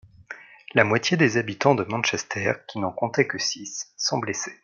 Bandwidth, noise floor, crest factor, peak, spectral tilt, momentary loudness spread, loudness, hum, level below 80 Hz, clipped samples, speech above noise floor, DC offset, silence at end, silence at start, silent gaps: 7.4 kHz; -44 dBFS; 22 dB; -2 dBFS; -4 dB/octave; 13 LU; -24 LUFS; none; -66 dBFS; under 0.1%; 20 dB; under 0.1%; 0.1 s; 0.2 s; none